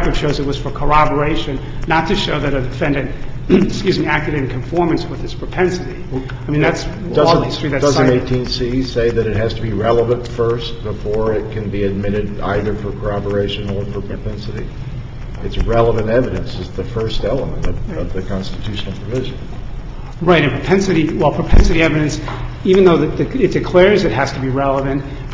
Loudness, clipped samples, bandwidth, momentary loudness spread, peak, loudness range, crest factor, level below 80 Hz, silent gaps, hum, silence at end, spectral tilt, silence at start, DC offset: -17 LUFS; under 0.1%; 7.8 kHz; 12 LU; 0 dBFS; 7 LU; 16 dB; -26 dBFS; none; none; 0 s; -6.5 dB/octave; 0 s; under 0.1%